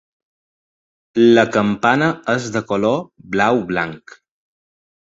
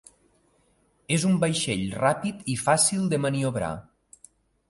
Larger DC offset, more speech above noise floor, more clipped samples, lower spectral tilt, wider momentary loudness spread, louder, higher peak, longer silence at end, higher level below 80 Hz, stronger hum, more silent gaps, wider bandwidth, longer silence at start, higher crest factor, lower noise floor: neither; first, over 73 dB vs 41 dB; neither; first, -6 dB/octave vs -4.5 dB/octave; about the same, 11 LU vs 9 LU; first, -17 LUFS vs -25 LUFS; first, -2 dBFS vs -8 dBFS; first, 1.15 s vs 0.9 s; about the same, -56 dBFS vs -56 dBFS; neither; neither; second, 7.8 kHz vs 12 kHz; about the same, 1.15 s vs 1.1 s; about the same, 18 dB vs 20 dB; first, under -90 dBFS vs -66 dBFS